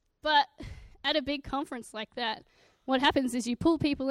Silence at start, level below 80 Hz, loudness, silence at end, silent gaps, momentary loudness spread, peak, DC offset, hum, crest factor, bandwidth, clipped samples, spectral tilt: 0.25 s; -54 dBFS; -29 LUFS; 0 s; none; 14 LU; -12 dBFS; under 0.1%; none; 18 dB; 14.5 kHz; under 0.1%; -4 dB/octave